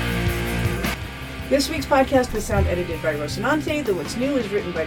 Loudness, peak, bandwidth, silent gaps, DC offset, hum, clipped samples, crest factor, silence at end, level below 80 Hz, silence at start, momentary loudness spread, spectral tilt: -23 LUFS; -4 dBFS; 19 kHz; none; under 0.1%; none; under 0.1%; 18 dB; 0 s; -34 dBFS; 0 s; 6 LU; -5.5 dB/octave